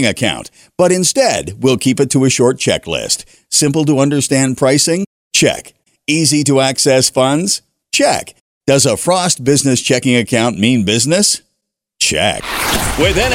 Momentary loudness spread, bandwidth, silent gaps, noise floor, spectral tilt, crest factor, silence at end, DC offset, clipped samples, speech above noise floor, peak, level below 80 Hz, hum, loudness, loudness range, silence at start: 6 LU; 16.5 kHz; 5.07-5.31 s, 8.41-8.61 s; -72 dBFS; -3.5 dB/octave; 14 dB; 0 s; under 0.1%; under 0.1%; 59 dB; 0 dBFS; -36 dBFS; none; -13 LUFS; 1 LU; 0 s